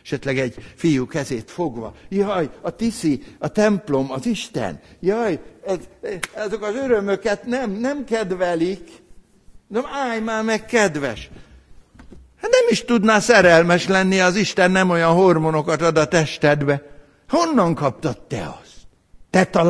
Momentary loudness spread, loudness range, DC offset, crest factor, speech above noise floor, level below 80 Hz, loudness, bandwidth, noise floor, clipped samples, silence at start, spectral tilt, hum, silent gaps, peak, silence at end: 12 LU; 9 LU; under 0.1%; 18 dB; 28 dB; -48 dBFS; -19 LUFS; 11 kHz; -47 dBFS; under 0.1%; 0.05 s; -5 dB/octave; none; none; -2 dBFS; 0 s